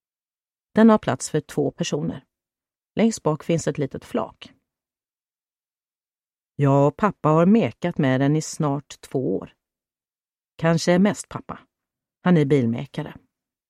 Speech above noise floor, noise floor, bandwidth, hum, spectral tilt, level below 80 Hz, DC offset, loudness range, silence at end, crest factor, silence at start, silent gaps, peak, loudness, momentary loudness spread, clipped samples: over 69 dB; under -90 dBFS; 12.5 kHz; none; -6.5 dB/octave; -58 dBFS; under 0.1%; 6 LU; 0.55 s; 18 dB; 0.75 s; none; -4 dBFS; -22 LUFS; 15 LU; under 0.1%